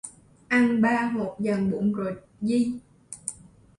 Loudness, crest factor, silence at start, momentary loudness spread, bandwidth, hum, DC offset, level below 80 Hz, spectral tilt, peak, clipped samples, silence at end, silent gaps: -26 LUFS; 16 dB; 0.05 s; 15 LU; 11.5 kHz; none; under 0.1%; -62 dBFS; -6 dB/octave; -10 dBFS; under 0.1%; 0.45 s; none